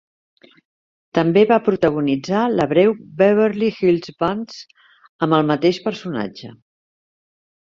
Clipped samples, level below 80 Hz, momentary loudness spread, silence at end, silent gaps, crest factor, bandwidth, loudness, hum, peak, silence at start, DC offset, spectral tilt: under 0.1%; -58 dBFS; 12 LU; 1.25 s; 5.09-5.19 s; 18 dB; 7.4 kHz; -18 LUFS; none; -2 dBFS; 1.15 s; under 0.1%; -7 dB/octave